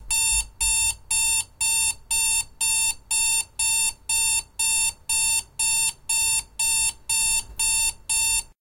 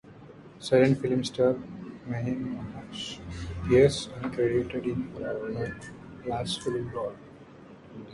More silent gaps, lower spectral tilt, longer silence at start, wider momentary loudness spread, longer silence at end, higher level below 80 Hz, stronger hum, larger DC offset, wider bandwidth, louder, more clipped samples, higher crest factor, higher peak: neither; second, 2.5 dB/octave vs -6 dB/octave; about the same, 0 s vs 0.05 s; second, 2 LU vs 19 LU; first, 0.15 s vs 0 s; first, -44 dBFS vs -50 dBFS; neither; neither; first, 16.5 kHz vs 11.5 kHz; first, -21 LUFS vs -28 LUFS; neither; second, 14 dB vs 20 dB; about the same, -10 dBFS vs -10 dBFS